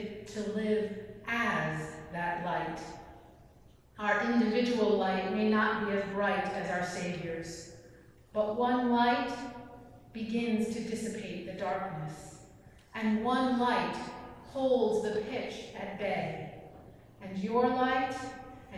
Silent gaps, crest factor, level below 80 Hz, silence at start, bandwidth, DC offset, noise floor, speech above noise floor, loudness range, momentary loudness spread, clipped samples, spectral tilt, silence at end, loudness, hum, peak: none; 18 dB; -62 dBFS; 0 s; 12.5 kHz; under 0.1%; -59 dBFS; 27 dB; 5 LU; 16 LU; under 0.1%; -5.5 dB/octave; 0 s; -32 LUFS; none; -16 dBFS